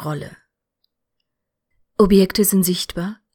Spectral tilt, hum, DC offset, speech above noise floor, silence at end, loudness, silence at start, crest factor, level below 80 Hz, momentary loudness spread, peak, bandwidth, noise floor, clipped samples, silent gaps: -5 dB/octave; none; under 0.1%; 62 dB; 0.2 s; -17 LUFS; 0 s; 18 dB; -42 dBFS; 17 LU; -2 dBFS; 19 kHz; -79 dBFS; under 0.1%; none